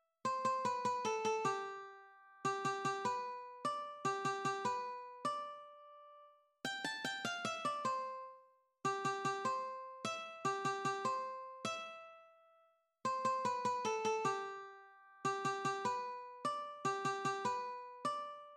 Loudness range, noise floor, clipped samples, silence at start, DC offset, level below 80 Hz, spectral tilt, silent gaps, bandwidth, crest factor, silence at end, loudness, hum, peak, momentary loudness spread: 3 LU; -73 dBFS; under 0.1%; 0.25 s; under 0.1%; -86 dBFS; -3.5 dB/octave; none; 13.5 kHz; 16 dB; 0 s; -40 LUFS; none; -24 dBFS; 12 LU